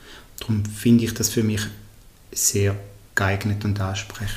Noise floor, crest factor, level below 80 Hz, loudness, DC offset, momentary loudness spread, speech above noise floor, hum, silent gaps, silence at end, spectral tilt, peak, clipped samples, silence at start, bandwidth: -45 dBFS; 20 dB; -46 dBFS; -22 LUFS; under 0.1%; 13 LU; 23 dB; none; none; 0 s; -4.5 dB/octave; -4 dBFS; under 0.1%; 0 s; 15.5 kHz